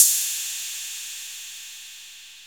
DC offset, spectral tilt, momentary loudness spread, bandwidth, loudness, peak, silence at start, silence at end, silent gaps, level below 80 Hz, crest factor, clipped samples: under 0.1%; 6.5 dB/octave; 17 LU; over 20 kHz; -25 LUFS; 0 dBFS; 0 s; 0 s; none; -78 dBFS; 26 dB; under 0.1%